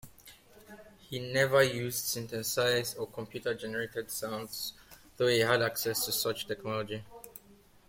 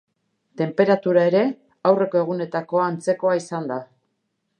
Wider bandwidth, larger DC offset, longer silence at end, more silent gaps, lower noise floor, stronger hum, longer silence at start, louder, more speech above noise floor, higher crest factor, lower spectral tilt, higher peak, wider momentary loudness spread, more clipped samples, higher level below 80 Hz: first, 16.5 kHz vs 10.5 kHz; neither; second, 0.35 s vs 0.75 s; neither; second, -60 dBFS vs -74 dBFS; neither; second, 0.05 s vs 0.55 s; second, -31 LUFS vs -21 LUFS; second, 28 dB vs 54 dB; about the same, 22 dB vs 18 dB; second, -3 dB/octave vs -7 dB/octave; second, -12 dBFS vs -4 dBFS; first, 14 LU vs 10 LU; neither; first, -66 dBFS vs -76 dBFS